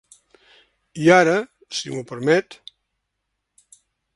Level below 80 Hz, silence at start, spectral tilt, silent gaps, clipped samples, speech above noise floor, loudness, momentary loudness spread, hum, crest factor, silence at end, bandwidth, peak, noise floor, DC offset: -64 dBFS; 0.95 s; -5 dB/octave; none; under 0.1%; 59 dB; -19 LUFS; 18 LU; none; 22 dB; 1.6 s; 11.5 kHz; 0 dBFS; -78 dBFS; under 0.1%